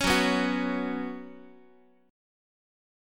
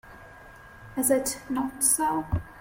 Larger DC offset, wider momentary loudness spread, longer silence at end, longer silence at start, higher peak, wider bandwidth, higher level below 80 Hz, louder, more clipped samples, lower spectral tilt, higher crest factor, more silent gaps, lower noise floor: neither; first, 18 LU vs 10 LU; first, 1 s vs 0 s; about the same, 0 s vs 0.05 s; about the same, -10 dBFS vs -8 dBFS; about the same, 17.5 kHz vs 16.5 kHz; about the same, -50 dBFS vs -48 dBFS; second, -28 LUFS vs -25 LUFS; neither; about the same, -4 dB/octave vs -4 dB/octave; about the same, 22 dB vs 20 dB; neither; first, -59 dBFS vs -48 dBFS